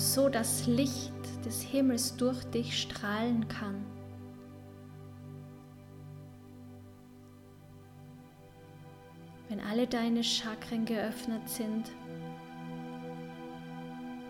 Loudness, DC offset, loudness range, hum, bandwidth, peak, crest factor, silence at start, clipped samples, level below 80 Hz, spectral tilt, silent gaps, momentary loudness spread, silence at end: -34 LUFS; under 0.1%; 20 LU; none; 17 kHz; -16 dBFS; 20 dB; 0 s; under 0.1%; -66 dBFS; -4 dB/octave; none; 23 LU; 0 s